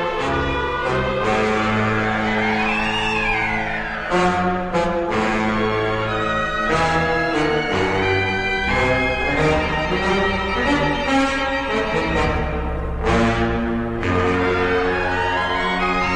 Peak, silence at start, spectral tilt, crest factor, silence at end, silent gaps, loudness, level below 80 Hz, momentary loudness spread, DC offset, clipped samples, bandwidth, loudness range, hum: -6 dBFS; 0 s; -5.5 dB/octave; 14 dB; 0 s; none; -19 LUFS; -32 dBFS; 3 LU; under 0.1%; under 0.1%; 11.5 kHz; 1 LU; none